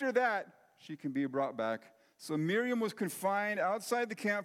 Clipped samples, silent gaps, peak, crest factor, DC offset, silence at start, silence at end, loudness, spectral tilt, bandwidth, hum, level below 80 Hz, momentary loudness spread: under 0.1%; none; -18 dBFS; 16 dB; under 0.1%; 0 s; 0 s; -34 LUFS; -5 dB/octave; 16.5 kHz; none; under -90 dBFS; 11 LU